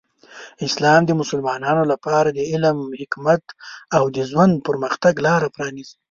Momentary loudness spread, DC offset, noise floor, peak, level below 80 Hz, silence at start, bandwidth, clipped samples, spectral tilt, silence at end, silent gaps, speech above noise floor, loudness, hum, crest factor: 12 LU; under 0.1%; -42 dBFS; -2 dBFS; -58 dBFS; 0.3 s; 7.6 kHz; under 0.1%; -5.5 dB/octave; 0.2 s; none; 23 dB; -19 LUFS; none; 18 dB